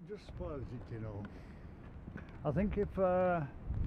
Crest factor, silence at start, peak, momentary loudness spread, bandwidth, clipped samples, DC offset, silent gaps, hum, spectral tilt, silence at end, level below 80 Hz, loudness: 16 dB; 0 s; -22 dBFS; 19 LU; 6.6 kHz; under 0.1%; under 0.1%; none; none; -9.5 dB/octave; 0 s; -48 dBFS; -37 LUFS